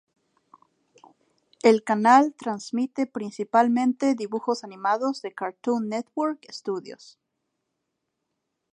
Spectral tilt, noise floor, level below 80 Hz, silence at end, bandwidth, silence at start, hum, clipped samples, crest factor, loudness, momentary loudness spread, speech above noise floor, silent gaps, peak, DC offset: -5 dB/octave; -80 dBFS; -80 dBFS; 1.8 s; 10.5 kHz; 1.65 s; none; under 0.1%; 22 dB; -24 LUFS; 14 LU; 56 dB; none; -4 dBFS; under 0.1%